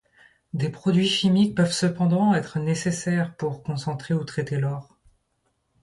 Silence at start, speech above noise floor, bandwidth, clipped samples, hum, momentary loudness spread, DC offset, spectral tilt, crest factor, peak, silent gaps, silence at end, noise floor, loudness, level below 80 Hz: 0.55 s; 49 dB; 11.5 kHz; under 0.1%; none; 10 LU; under 0.1%; -5.5 dB/octave; 14 dB; -10 dBFS; none; 1 s; -72 dBFS; -24 LUFS; -60 dBFS